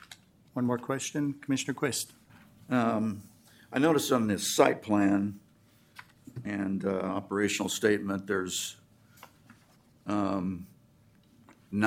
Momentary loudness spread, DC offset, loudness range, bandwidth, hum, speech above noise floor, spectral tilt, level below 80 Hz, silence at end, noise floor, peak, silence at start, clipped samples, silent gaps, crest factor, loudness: 15 LU; under 0.1%; 6 LU; 16.5 kHz; none; 33 dB; -4.5 dB/octave; -72 dBFS; 0 s; -62 dBFS; -6 dBFS; 0.1 s; under 0.1%; none; 24 dB; -30 LUFS